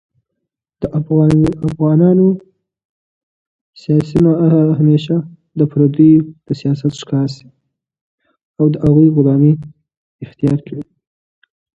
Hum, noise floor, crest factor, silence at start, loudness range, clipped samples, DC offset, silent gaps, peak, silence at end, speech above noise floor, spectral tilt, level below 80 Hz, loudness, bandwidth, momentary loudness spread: none; -76 dBFS; 14 dB; 0.8 s; 3 LU; under 0.1%; under 0.1%; 2.85-3.73 s, 8.01-8.18 s, 8.45-8.54 s, 9.97-10.19 s; 0 dBFS; 0.95 s; 64 dB; -9.5 dB/octave; -44 dBFS; -13 LUFS; 7.8 kHz; 14 LU